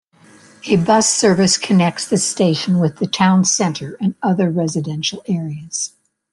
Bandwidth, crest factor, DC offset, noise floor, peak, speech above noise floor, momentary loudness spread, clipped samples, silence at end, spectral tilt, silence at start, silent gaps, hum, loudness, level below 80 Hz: 11.5 kHz; 16 dB; under 0.1%; -47 dBFS; -2 dBFS; 31 dB; 10 LU; under 0.1%; 0.45 s; -4.5 dB/octave; 0.65 s; none; none; -16 LUFS; -56 dBFS